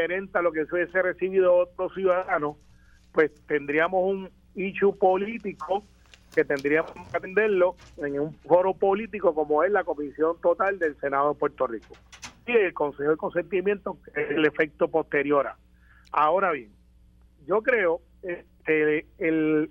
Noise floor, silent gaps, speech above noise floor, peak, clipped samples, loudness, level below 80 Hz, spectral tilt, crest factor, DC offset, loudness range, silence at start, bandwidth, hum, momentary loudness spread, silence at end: -56 dBFS; none; 31 dB; -6 dBFS; under 0.1%; -25 LUFS; -58 dBFS; -6.5 dB/octave; 20 dB; under 0.1%; 2 LU; 0 s; 7.6 kHz; none; 10 LU; 0.05 s